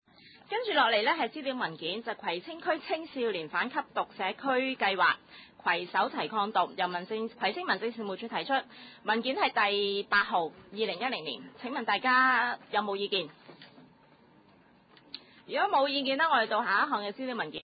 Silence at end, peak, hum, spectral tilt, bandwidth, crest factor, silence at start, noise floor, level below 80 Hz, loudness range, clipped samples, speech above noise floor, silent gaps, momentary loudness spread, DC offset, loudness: 0 s; -14 dBFS; none; -7.5 dB/octave; 5 kHz; 18 dB; 0.5 s; -61 dBFS; -76 dBFS; 4 LU; under 0.1%; 31 dB; none; 10 LU; under 0.1%; -30 LUFS